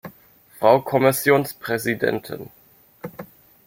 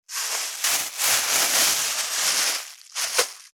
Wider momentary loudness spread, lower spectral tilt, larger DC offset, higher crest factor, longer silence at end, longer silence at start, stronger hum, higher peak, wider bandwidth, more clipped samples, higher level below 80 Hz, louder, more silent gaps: first, 22 LU vs 8 LU; first, -5 dB/octave vs 2.5 dB/octave; neither; about the same, 20 dB vs 20 dB; first, 0.4 s vs 0.1 s; about the same, 0.05 s vs 0.1 s; neither; about the same, -2 dBFS vs -4 dBFS; second, 16.5 kHz vs over 20 kHz; neither; first, -62 dBFS vs -74 dBFS; about the same, -20 LUFS vs -21 LUFS; neither